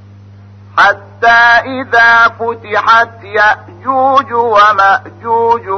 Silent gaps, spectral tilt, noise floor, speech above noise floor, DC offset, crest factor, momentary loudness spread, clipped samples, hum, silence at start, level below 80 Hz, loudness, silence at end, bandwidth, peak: none; -4 dB/octave; -35 dBFS; 25 dB; under 0.1%; 10 dB; 9 LU; under 0.1%; none; 0.75 s; -50 dBFS; -9 LUFS; 0 s; 6.8 kHz; 0 dBFS